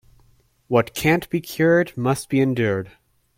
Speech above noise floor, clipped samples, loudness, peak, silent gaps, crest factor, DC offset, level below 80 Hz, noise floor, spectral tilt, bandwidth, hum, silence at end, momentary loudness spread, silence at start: 38 dB; under 0.1%; -21 LUFS; -4 dBFS; none; 18 dB; under 0.1%; -52 dBFS; -58 dBFS; -6 dB/octave; 16.5 kHz; none; 0.5 s; 8 LU; 0.7 s